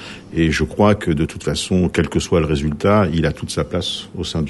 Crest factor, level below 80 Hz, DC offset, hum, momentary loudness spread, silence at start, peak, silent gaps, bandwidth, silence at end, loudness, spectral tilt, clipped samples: 16 dB; -34 dBFS; under 0.1%; none; 8 LU; 0 s; -2 dBFS; none; 12 kHz; 0 s; -18 LUFS; -5.5 dB/octave; under 0.1%